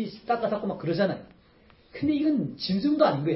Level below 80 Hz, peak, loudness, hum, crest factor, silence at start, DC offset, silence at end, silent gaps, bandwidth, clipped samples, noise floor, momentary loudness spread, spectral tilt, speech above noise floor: -60 dBFS; -8 dBFS; -27 LUFS; none; 18 dB; 0 s; under 0.1%; 0 s; none; 5.8 kHz; under 0.1%; -57 dBFS; 8 LU; -10.5 dB/octave; 32 dB